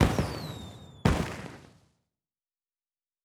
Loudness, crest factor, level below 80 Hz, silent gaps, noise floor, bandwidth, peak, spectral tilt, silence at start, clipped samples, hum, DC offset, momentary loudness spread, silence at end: -31 LUFS; 26 dB; -42 dBFS; none; under -90 dBFS; 19 kHz; -8 dBFS; -6 dB/octave; 0 s; under 0.1%; none; under 0.1%; 18 LU; 1.6 s